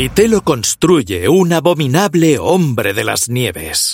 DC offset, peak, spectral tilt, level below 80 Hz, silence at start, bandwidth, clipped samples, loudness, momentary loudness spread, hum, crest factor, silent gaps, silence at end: under 0.1%; 0 dBFS; -4.5 dB/octave; -40 dBFS; 0 s; 17 kHz; under 0.1%; -13 LUFS; 4 LU; none; 12 dB; none; 0 s